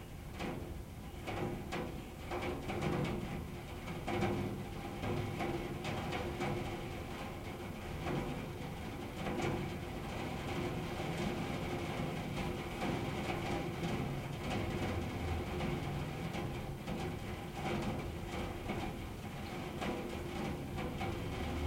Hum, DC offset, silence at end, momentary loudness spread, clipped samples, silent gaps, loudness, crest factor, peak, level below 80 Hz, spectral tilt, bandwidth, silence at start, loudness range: none; under 0.1%; 0 s; 6 LU; under 0.1%; none; -40 LUFS; 16 dB; -22 dBFS; -50 dBFS; -6 dB/octave; 16 kHz; 0 s; 2 LU